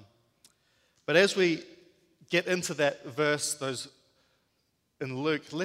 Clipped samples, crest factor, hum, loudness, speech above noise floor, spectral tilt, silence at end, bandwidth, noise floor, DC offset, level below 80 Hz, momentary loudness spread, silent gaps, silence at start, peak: under 0.1%; 24 dB; none; -28 LUFS; 47 dB; -3.5 dB/octave; 0 s; 16 kHz; -75 dBFS; under 0.1%; -76 dBFS; 15 LU; none; 1.1 s; -8 dBFS